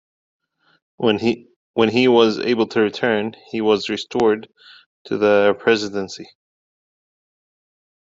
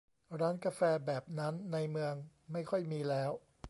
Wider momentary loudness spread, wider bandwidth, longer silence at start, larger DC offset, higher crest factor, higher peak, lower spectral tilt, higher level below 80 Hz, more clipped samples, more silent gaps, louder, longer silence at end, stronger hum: first, 12 LU vs 9 LU; second, 7.8 kHz vs 11.5 kHz; first, 1 s vs 0.3 s; neither; about the same, 18 dB vs 18 dB; first, -2 dBFS vs -20 dBFS; second, -5.5 dB/octave vs -7 dB/octave; about the same, -64 dBFS vs -68 dBFS; neither; first, 1.56-1.74 s, 4.86-5.05 s vs none; first, -19 LUFS vs -37 LUFS; first, 1.8 s vs 0 s; neither